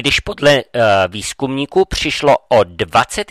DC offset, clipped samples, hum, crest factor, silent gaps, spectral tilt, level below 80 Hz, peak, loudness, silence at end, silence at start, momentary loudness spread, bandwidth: under 0.1%; under 0.1%; none; 12 dB; none; -4 dB/octave; -36 dBFS; -2 dBFS; -14 LUFS; 0.05 s; 0 s; 7 LU; 14.5 kHz